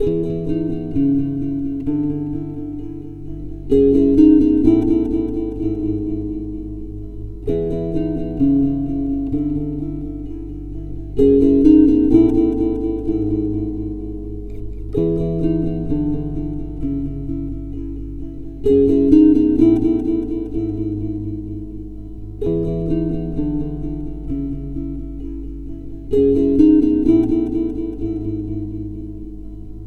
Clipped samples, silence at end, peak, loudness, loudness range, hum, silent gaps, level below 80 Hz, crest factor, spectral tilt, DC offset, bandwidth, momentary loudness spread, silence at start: under 0.1%; 0 s; 0 dBFS; -18 LUFS; 8 LU; 50 Hz at -30 dBFS; none; -32 dBFS; 18 dB; -11 dB/octave; under 0.1%; 4.3 kHz; 19 LU; 0 s